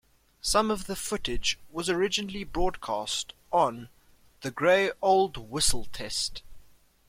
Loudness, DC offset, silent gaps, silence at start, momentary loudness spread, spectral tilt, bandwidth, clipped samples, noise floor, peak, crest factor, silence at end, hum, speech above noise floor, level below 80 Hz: -28 LUFS; under 0.1%; none; 0.45 s; 10 LU; -2.5 dB/octave; 16.5 kHz; under 0.1%; -56 dBFS; -10 dBFS; 18 dB; 0.45 s; none; 29 dB; -44 dBFS